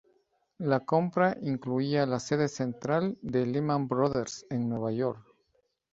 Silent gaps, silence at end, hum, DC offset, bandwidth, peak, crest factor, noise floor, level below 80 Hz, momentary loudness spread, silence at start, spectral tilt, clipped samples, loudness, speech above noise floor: none; 0.7 s; none; under 0.1%; 8 kHz; -10 dBFS; 20 dB; -74 dBFS; -64 dBFS; 7 LU; 0.6 s; -6.5 dB/octave; under 0.1%; -30 LUFS; 45 dB